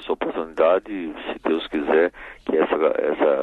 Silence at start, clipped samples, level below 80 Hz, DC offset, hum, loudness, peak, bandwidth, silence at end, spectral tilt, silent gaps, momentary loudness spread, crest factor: 0 s; under 0.1%; -54 dBFS; under 0.1%; none; -22 LUFS; -6 dBFS; 4.4 kHz; 0 s; -6.5 dB/octave; none; 10 LU; 16 dB